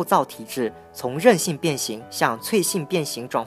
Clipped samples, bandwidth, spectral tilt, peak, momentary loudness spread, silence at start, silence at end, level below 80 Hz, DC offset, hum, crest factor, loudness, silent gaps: under 0.1%; 15.5 kHz; -4 dB/octave; 0 dBFS; 11 LU; 0 s; 0 s; -66 dBFS; under 0.1%; none; 22 dB; -23 LUFS; none